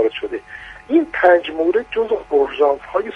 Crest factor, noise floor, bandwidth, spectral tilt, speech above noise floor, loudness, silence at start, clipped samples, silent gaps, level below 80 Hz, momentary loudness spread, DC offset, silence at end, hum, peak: 18 dB; -37 dBFS; 6.4 kHz; -5.5 dB/octave; 20 dB; -17 LUFS; 0 s; under 0.1%; none; -50 dBFS; 14 LU; under 0.1%; 0 s; none; 0 dBFS